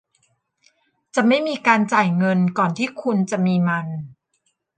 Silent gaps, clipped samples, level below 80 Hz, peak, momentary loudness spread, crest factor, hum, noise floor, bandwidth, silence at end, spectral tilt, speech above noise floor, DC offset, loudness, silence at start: none; under 0.1%; -68 dBFS; -2 dBFS; 8 LU; 18 dB; none; -70 dBFS; 9.4 kHz; 0.65 s; -6.5 dB/octave; 51 dB; under 0.1%; -19 LUFS; 1.15 s